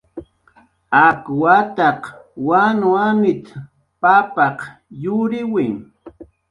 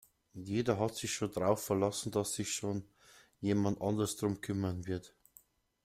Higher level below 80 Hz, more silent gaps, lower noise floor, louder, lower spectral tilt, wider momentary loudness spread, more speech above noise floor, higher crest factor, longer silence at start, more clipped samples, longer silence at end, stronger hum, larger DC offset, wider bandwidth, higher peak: first, -58 dBFS vs -66 dBFS; neither; second, -54 dBFS vs -66 dBFS; first, -16 LUFS vs -35 LUFS; first, -7.5 dB/octave vs -5 dB/octave; first, 20 LU vs 8 LU; first, 38 dB vs 31 dB; about the same, 18 dB vs 20 dB; second, 0.15 s vs 0.35 s; neither; second, 0.3 s vs 0.75 s; neither; neither; second, 11 kHz vs 16 kHz; first, 0 dBFS vs -16 dBFS